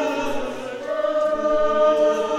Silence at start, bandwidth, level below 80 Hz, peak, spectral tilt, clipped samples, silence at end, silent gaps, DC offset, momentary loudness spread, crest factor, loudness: 0 s; 12.5 kHz; -46 dBFS; -8 dBFS; -4 dB/octave; under 0.1%; 0 s; none; under 0.1%; 11 LU; 14 dB; -21 LUFS